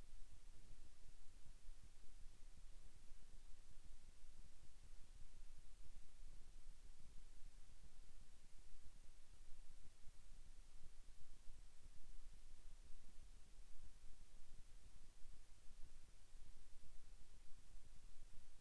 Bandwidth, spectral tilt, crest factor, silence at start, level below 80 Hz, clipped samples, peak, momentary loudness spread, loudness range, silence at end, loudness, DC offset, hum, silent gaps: 11 kHz; -3.5 dB/octave; 10 dB; 0 s; -58 dBFS; under 0.1%; -38 dBFS; 2 LU; 1 LU; 0 s; -69 LUFS; under 0.1%; none; none